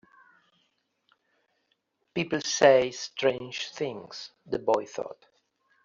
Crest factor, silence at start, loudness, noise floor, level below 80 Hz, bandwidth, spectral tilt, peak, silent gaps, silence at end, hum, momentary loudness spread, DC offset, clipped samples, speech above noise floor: 24 dB; 2.15 s; -27 LUFS; -75 dBFS; -68 dBFS; 7.6 kHz; -2.5 dB/octave; -4 dBFS; none; 0.7 s; none; 19 LU; under 0.1%; under 0.1%; 48 dB